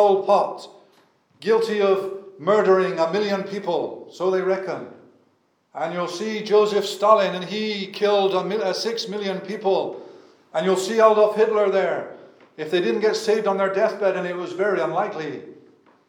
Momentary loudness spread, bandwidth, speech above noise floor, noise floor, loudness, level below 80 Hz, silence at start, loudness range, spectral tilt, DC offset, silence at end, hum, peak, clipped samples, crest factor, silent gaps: 14 LU; 16 kHz; 44 dB; -65 dBFS; -21 LUFS; -86 dBFS; 0 s; 4 LU; -5 dB/octave; under 0.1%; 0.55 s; none; -2 dBFS; under 0.1%; 20 dB; none